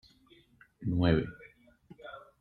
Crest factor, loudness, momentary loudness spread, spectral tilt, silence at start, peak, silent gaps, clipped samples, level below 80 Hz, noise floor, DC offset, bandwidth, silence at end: 22 dB; -31 LUFS; 23 LU; -9.5 dB/octave; 0.8 s; -12 dBFS; none; under 0.1%; -52 dBFS; -63 dBFS; under 0.1%; 4.8 kHz; 0.2 s